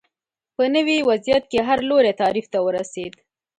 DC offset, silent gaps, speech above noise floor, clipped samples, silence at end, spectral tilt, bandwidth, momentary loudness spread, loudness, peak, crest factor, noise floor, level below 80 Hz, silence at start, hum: under 0.1%; none; 65 dB; under 0.1%; 0.5 s; -4.5 dB/octave; 9.4 kHz; 14 LU; -19 LUFS; -6 dBFS; 14 dB; -85 dBFS; -56 dBFS; 0.6 s; none